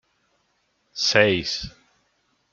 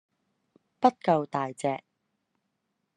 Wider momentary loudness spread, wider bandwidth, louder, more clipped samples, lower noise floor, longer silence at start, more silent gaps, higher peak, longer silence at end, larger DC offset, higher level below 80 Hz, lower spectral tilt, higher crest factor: first, 21 LU vs 8 LU; second, 7.6 kHz vs 11 kHz; first, -21 LUFS vs -28 LUFS; neither; second, -69 dBFS vs -80 dBFS; first, 0.95 s vs 0.8 s; neither; first, -2 dBFS vs -6 dBFS; second, 0.85 s vs 1.2 s; neither; first, -54 dBFS vs -78 dBFS; second, -3 dB/octave vs -6.5 dB/octave; about the same, 24 dB vs 24 dB